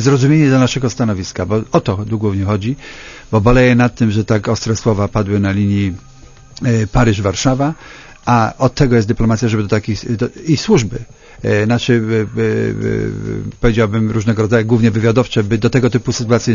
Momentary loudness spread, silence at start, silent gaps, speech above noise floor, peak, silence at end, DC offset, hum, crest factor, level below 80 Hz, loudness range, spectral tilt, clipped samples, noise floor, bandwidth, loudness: 9 LU; 0 s; none; 24 dB; 0 dBFS; 0 s; under 0.1%; none; 14 dB; -32 dBFS; 2 LU; -6.5 dB/octave; under 0.1%; -38 dBFS; 7.4 kHz; -15 LUFS